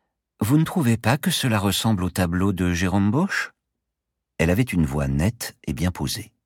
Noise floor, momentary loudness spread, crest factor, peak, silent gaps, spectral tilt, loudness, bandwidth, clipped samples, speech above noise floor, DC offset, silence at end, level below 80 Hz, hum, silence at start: -82 dBFS; 7 LU; 18 dB; -4 dBFS; none; -5.5 dB/octave; -22 LUFS; 18 kHz; under 0.1%; 60 dB; under 0.1%; 0.2 s; -40 dBFS; none; 0.4 s